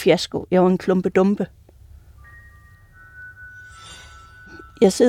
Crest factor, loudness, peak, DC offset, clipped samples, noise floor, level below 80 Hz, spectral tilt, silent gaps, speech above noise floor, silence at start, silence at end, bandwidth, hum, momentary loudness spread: 18 dB; -19 LUFS; -4 dBFS; under 0.1%; under 0.1%; -48 dBFS; -50 dBFS; -6 dB/octave; none; 31 dB; 0 s; 0 s; 14 kHz; none; 24 LU